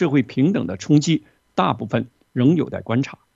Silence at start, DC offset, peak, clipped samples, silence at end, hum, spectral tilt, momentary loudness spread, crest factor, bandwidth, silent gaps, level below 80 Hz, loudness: 0 s; under 0.1%; -2 dBFS; under 0.1%; 0.2 s; none; -6.5 dB/octave; 7 LU; 18 dB; 7.8 kHz; none; -60 dBFS; -21 LUFS